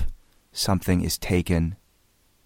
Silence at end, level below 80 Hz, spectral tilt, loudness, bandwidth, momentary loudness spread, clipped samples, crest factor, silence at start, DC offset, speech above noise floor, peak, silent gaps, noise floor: 0.7 s; -36 dBFS; -5 dB/octave; -25 LUFS; 16.5 kHz; 14 LU; under 0.1%; 18 dB; 0 s; under 0.1%; 40 dB; -8 dBFS; none; -63 dBFS